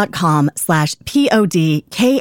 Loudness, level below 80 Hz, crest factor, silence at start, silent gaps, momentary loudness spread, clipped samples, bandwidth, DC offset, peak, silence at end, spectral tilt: -15 LUFS; -50 dBFS; 12 dB; 0 s; none; 3 LU; under 0.1%; 17 kHz; under 0.1%; -2 dBFS; 0 s; -5.5 dB/octave